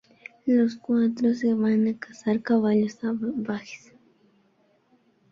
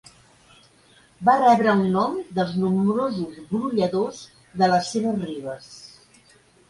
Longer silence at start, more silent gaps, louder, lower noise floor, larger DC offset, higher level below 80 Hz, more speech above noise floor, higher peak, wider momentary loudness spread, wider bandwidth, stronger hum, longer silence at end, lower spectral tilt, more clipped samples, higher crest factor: second, 0.45 s vs 1.2 s; neither; second, -25 LUFS vs -22 LUFS; first, -65 dBFS vs -56 dBFS; neither; second, -70 dBFS vs -60 dBFS; first, 41 dB vs 34 dB; second, -10 dBFS vs -4 dBFS; second, 11 LU vs 18 LU; second, 7.2 kHz vs 11.5 kHz; neither; first, 1.55 s vs 0.8 s; about the same, -7.5 dB/octave vs -6.5 dB/octave; neither; about the same, 16 dB vs 18 dB